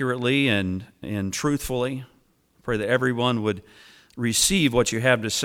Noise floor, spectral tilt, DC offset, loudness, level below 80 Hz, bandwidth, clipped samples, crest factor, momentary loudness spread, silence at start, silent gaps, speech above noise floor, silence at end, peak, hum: -62 dBFS; -4 dB/octave; under 0.1%; -23 LUFS; -48 dBFS; 18 kHz; under 0.1%; 18 dB; 12 LU; 0 s; none; 38 dB; 0 s; -6 dBFS; none